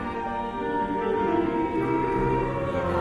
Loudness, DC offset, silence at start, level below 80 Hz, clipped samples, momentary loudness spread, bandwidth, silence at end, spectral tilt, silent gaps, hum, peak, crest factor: -26 LUFS; under 0.1%; 0 s; -42 dBFS; under 0.1%; 5 LU; 10 kHz; 0 s; -8 dB/octave; none; none; -12 dBFS; 14 dB